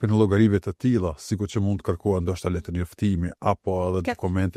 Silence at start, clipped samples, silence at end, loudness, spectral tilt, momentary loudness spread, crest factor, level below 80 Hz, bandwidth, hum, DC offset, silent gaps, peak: 0 s; under 0.1%; 0.05 s; -25 LUFS; -7.5 dB/octave; 8 LU; 16 dB; -44 dBFS; 13.5 kHz; none; under 0.1%; none; -6 dBFS